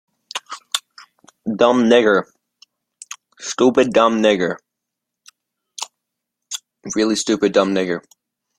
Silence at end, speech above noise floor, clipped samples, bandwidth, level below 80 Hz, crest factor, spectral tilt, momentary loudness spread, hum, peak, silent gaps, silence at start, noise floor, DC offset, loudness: 0.6 s; 65 dB; under 0.1%; 15.5 kHz; -60 dBFS; 18 dB; -4 dB/octave; 17 LU; none; -2 dBFS; none; 0.35 s; -81 dBFS; under 0.1%; -17 LUFS